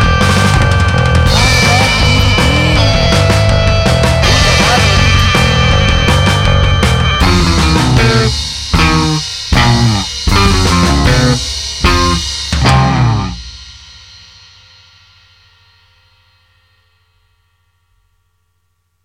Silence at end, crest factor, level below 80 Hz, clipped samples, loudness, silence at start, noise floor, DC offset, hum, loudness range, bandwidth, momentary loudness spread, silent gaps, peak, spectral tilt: 5.3 s; 10 dB; -18 dBFS; under 0.1%; -10 LUFS; 0 s; -63 dBFS; under 0.1%; 50 Hz at -35 dBFS; 5 LU; 16 kHz; 6 LU; none; 0 dBFS; -4.5 dB/octave